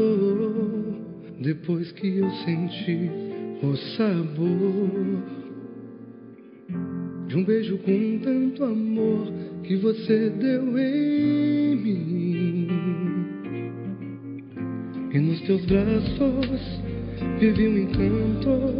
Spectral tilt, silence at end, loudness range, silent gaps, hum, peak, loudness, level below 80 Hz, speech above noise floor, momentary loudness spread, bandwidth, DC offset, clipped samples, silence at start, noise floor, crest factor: -7.5 dB/octave; 0 s; 5 LU; none; none; -8 dBFS; -25 LUFS; -46 dBFS; 22 dB; 12 LU; 5.4 kHz; under 0.1%; under 0.1%; 0 s; -45 dBFS; 16 dB